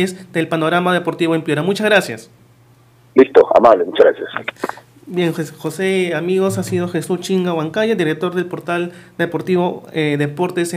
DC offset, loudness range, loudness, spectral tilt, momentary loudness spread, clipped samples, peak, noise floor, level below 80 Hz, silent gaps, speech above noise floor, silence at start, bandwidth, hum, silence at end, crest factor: under 0.1%; 5 LU; -17 LUFS; -6 dB/octave; 13 LU; 0.3%; 0 dBFS; -49 dBFS; -60 dBFS; none; 33 dB; 0 s; 15.5 kHz; none; 0 s; 16 dB